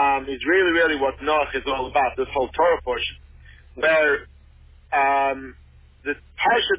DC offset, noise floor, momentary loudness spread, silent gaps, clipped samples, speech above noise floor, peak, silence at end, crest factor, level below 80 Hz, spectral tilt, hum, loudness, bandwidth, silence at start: under 0.1%; -49 dBFS; 12 LU; none; under 0.1%; 28 dB; -8 dBFS; 0 s; 14 dB; -46 dBFS; -7.5 dB/octave; none; -21 LUFS; 4 kHz; 0 s